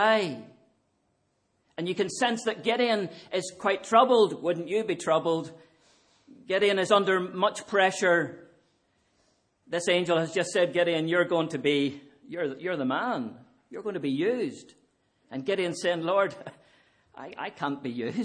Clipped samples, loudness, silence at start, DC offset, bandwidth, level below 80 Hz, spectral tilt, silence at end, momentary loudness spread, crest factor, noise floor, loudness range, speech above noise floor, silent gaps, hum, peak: under 0.1%; -27 LUFS; 0 s; under 0.1%; 10.5 kHz; -78 dBFS; -4.5 dB/octave; 0 s; 15 LU; 22 dB; -73 dBFS; 6 LU; 46 dB; none; none; -6 dBFS